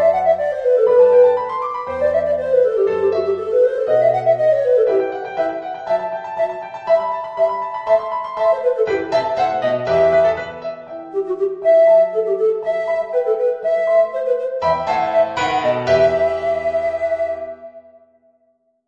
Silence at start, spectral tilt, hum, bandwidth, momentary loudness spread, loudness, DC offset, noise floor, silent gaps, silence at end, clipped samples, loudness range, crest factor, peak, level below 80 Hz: 0 s; -6 dB/octave; none; 7.4 kHz; 10 LU; -17 LUFS; under 0.1%; -63 dBFS; none; 1.1 s; under 0.1%; 4 LU; 14 dB; -4 dBFS; -54 dBFS